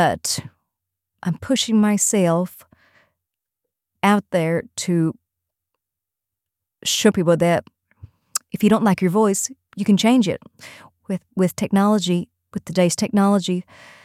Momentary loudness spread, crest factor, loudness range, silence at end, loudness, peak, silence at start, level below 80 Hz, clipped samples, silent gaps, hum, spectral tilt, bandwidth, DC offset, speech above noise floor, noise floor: 11 LU; 18 dB; 4 LU; 0.45 s; -20 LUFS; -4 dBFS; 0 s; -58 dBFS; under 0.1%; none; none; -5 dB/octave; 15.5 kHz; under 0.1%; 66 dB; -85 dBFS